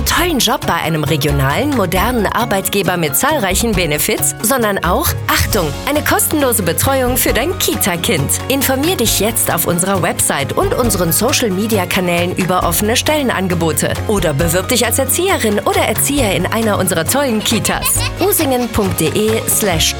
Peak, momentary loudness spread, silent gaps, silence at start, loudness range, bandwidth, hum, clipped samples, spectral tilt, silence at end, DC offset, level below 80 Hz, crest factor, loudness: -2 dBFS; 3 LU; none; 0 s; 1 LU; over 20 kHz; none; under 0.1%; -3.5 dB/octave; 0 s; under 0.1%; -30 dBFS; 12 dB; -14 LUFS